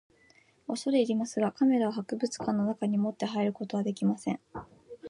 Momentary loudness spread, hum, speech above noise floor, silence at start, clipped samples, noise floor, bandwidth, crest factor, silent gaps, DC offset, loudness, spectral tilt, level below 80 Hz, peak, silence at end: 12 LU; none; 34 dB; 0.7 s; under 0.1%; -63 dBFS; 11 kHz; 16 dB; none; under 0.1%; -30 LUFS; -6 dB/octave; -68 dBFS; -14 dBFS; 0 s